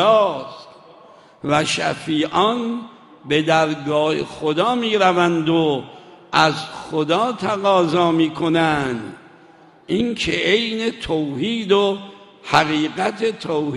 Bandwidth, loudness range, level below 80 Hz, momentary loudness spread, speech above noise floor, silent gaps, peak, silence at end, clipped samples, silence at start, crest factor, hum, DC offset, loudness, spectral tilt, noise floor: 11.5 kHz; 2 LU; -52 dBFS; 10 LU; 29 dB; none; 0 dBFS; 0 s; under 0.1%; 0 s; 20 dB; none; under 0.1%; -19 LUFS; -5 dB/octave; -48 dBFS